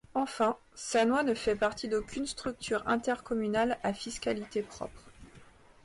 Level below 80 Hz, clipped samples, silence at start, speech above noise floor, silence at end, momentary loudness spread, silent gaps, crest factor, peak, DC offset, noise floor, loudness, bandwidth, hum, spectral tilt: -58 dBFS; under 0.1%; 0.15 s; 24 dB; 0.4 s; 9 LU; none; 14 dB; -18 dBFS; under 0.1%; -56 dBFS; -32 LUFS; 11.5 kHz; none; -4 dB/octave